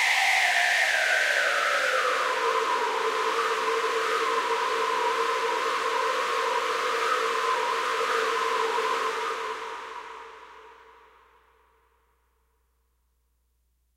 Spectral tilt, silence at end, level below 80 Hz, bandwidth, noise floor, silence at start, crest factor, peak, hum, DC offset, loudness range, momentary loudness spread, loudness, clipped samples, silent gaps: 1 dB/octave; 3.2 s; -70 dBFS; 16 kHz; -71 dBFS; 0 s; 18 dB; -10 dBFS; none; under 0.1%; 10 LU; 9 LU; -25 LUFS; under 0.1%; none